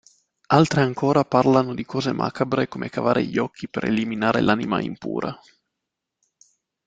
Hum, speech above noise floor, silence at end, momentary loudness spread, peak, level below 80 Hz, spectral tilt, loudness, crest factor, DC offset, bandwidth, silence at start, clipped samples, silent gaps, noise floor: none; 61 dB; 1.5 s; 10 LU; -2 dBFS; -56 dBFS; -6.5 dB/octave; -22 LUFS; 20 dB; under 0.1%; 9.2 kHz; 0.5 s; under 0.1%; none; -83 dBFS